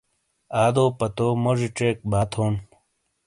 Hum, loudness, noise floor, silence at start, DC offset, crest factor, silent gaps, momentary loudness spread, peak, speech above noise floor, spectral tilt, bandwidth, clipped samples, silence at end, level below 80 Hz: none; -23 LUFS; -69 dBFS; 0.5 s; under 0.1%; 18 dB; none; 6 LU; -6 dBFS; 47 dB; -6.5 dB/octave; 11.5 kHz; under 0.1%; 0.6 s; -48 dBFS